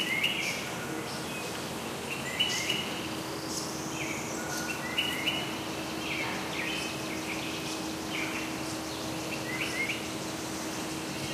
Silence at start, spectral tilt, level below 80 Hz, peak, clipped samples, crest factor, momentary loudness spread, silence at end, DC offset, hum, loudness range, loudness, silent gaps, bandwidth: 0 s; -2.5 dB/octave; -60 dBFS; -14 dBFS; under 0.1%; 20 dB; 7 LU; 0 s; under 0.1%; none; 2 LU; -32 LUFS; none; 15.5 kHz